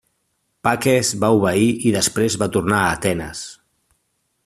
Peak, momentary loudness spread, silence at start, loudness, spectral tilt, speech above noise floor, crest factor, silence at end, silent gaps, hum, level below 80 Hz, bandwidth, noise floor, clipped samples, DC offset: -2 dBFS; 9 LU; 0.65 s; -18 LUFS; -4.5 dB/octave; 52 dB; 18 dB; 0.9 s; none; none; -50 dBFS; 14.5 kHz; -70 dBFS; under 0.1%; under 0.1%